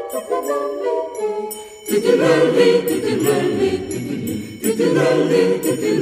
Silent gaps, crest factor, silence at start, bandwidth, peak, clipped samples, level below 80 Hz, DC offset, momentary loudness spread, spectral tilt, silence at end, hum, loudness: none; 16 dB; 0 s; 14 kHz; -2 dBFS; under 0.1%; -56 dBFS; under 0.1%; 10 LU; -5 dB/octave; 0 s; none; -18 LUFS